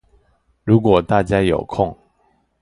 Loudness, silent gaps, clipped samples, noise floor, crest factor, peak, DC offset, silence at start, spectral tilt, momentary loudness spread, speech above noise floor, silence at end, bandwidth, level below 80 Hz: -17 LUFS; none; under 0.1%; -62 dBFS; 18 dB; 0 dBFS; under 0.1%; 0.65 s; -8 dB/octave; 9 LU; 46 dB; 0.7 s; 11 kHz; -40 dBFS